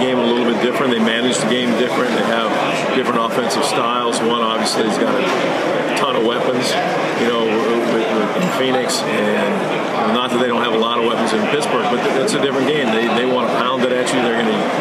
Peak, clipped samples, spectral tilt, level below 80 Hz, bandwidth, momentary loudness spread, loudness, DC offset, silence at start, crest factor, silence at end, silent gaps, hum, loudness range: -2 dBFS; under 0.1%; -4 dB/octave; -66 dBFS; 14.5 kHz; 1 LU; -16 LUFS; under 0.1%; 0 s; 14 dB; 0 s; none; none; 1 LU